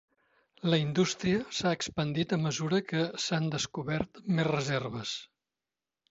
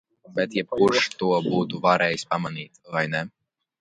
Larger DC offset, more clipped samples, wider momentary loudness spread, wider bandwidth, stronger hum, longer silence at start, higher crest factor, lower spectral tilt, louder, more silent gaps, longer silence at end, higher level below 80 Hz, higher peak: neither; neither; second, 6 LU vs 12 LU; second, 8 kHz vs 11 kHz; neither; first, 0.65 s vs 0.3 s; about the same, 20 dB vs 20 dB; about the same, -5 dB/octave vs -5 dB/octave; second, -31 LUFS vs -24 LUFS; neither; first, 0.85 s vs 0.55 s; about the same, -62 dBFS vs -64 dBFS; second, -12 dBFS vs -4 dBFS